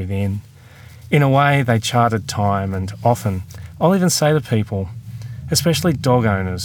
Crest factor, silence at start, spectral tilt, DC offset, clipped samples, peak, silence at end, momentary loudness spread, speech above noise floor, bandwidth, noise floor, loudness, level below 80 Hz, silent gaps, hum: 16 dB; 0 s; -5.5 dB/octave; under 0.1%; under 0.1%; -2 dBFS; 0 s; 14 LU; 24 dB; over 20 kHz; -41 dBFS; -18 LUFS; -50 dBFS; none; none